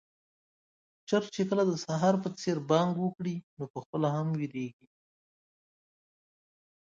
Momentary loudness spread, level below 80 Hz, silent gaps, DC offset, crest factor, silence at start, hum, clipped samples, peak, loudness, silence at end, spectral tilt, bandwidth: 12 LU; -74 dBFS; 3.43-3.57 s, 3.70-3.74 s, 3.86-3.93 s; under 0.1%; 22 dB; 1.1 s; none; under 0.1%; -12 dBFS; -31 LUFS; 2.25 s; -6.5 dB/octave; 7.6 kHz